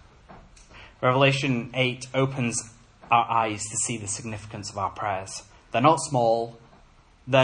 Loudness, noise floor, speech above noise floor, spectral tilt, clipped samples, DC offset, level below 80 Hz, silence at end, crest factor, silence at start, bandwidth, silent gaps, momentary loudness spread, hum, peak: -25 LUFS; -55 dBFS; 30 dB; -4 dB/octave; under 0.1%; under 0.1%; -56 dBFS; 0 s; 22 dB; 0.3 s; 10.5 kHz; none; 14 LU; none; -4 dBFS